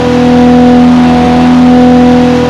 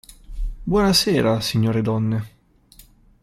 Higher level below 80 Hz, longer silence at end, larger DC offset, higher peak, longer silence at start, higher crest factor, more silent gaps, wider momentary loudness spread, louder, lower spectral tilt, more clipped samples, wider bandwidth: first, -26 dBFS vs -36 dBFS; second, 0 s vs 0.95 s; neither; first, 0 dBFS vs -6 dBFS; about the same, 0 s vs 0.1 s; second, 4 dB vs 16 dB; neither; second, 2 LU vs 18 LU; first, -4 LUFS vs -20 LUFS; first, -7 dB/octave vs -5 dB/octave; first, 10% vs under 0.1%; second, 7.8 kHz vs 15.5 kHz